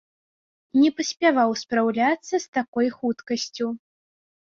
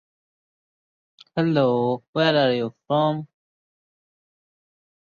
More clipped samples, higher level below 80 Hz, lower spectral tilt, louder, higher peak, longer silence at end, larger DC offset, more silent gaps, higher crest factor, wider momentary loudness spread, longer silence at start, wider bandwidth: neither; about the same, -70 dBFS vs -68 dBFS; second, -3.5 dB/octave vs -7.5 dB/octave; about the same, -23 LUFS vs -22 LUFS; about the same, -6 dBFS vs -6 dBFS; second, 0.8 s vs 1.9 s; neither; about the same, 2.48-2.53 s, 2.68-2.73 s vs 2.08-2.13 s; about the same, 18 dB vs 20 dB; about the same, 9 LU vs 8 LU; second, 0.75 s vs 1.35 s; about the same, 7.6 kHz vs 7 kHz